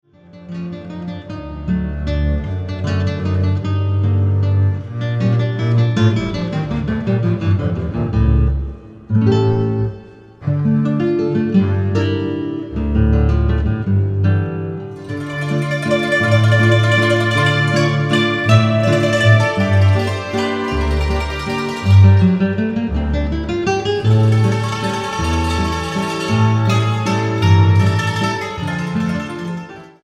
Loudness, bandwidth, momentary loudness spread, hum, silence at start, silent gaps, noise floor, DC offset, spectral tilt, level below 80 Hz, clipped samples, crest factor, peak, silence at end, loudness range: -16 LUFS; 10.5 kHz; 11 LU; none; 0.35 s; none; -37 dBFS; under 0.1%; -7 dB/octave; -28 dBFS; under 0.1%; 16 dB; 0 dBFS; 0.15 s; 4 LU